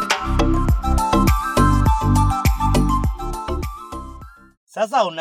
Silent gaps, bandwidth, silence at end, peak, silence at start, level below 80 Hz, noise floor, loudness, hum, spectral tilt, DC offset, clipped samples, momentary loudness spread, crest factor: 4.57-4.67 s; 15.5 kHz; 0 s; -4 dBFS; 0 s; -22 dBFS; -39 dBFS; -19 LUFS; none; -6 dB/octave; under 0.1%; under 0.1%; 15 LU; 14 dB